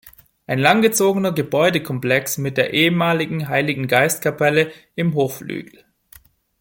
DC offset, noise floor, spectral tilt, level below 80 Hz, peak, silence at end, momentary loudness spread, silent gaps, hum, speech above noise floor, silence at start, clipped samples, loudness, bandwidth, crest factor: under 0.1%; -50 dBFS; -4.5 dB/octave; -58 dBFS; -2 dBFS; 0.95 s; 8 LU; none; none; 31 dB; 0.05 s; under 0.1%; -18 LUFS; 17 kHz; 18 dB